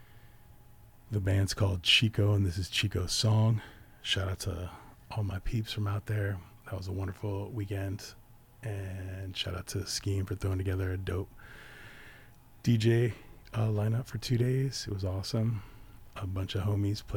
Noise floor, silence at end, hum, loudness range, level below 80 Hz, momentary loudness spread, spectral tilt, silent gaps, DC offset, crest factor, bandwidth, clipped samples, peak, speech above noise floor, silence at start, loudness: -55 dBFS; 0 s; none; 8 LU; -50 dBFS; 16 LU; -5 dB/octave; none; under 0.1%; 20 dB; 18 kHz; under 0.1%; -12 dBFS; 24 dB; 0 s; -32 LUFS